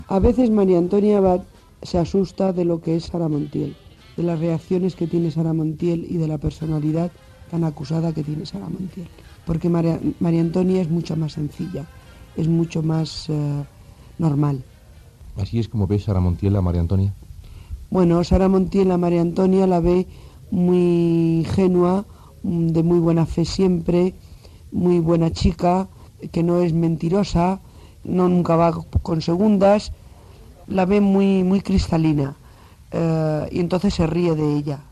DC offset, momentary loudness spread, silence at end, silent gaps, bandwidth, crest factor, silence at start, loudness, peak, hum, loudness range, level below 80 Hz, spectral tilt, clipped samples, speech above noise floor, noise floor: under 0.1%; 13 LU; 0.1 s; none; 11 kHz; 16 dB; 0 s; -20 LUFS; -4 dBFS; none; 5 LU; -36 dBFS; -8.5 dB/octave; under 0.1%; 27 dB; -46 dBFS